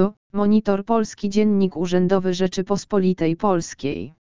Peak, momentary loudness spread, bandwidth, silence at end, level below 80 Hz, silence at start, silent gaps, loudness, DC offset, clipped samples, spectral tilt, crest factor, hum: -4 dBFS; 5 LU; 7.6 kHz; 0.1 s; -50 dBFS; 0 s; 0.17-0.30 s; -21 LUFS; 2%; under 0.1%; -6.5 dB/octave; 16 dB; none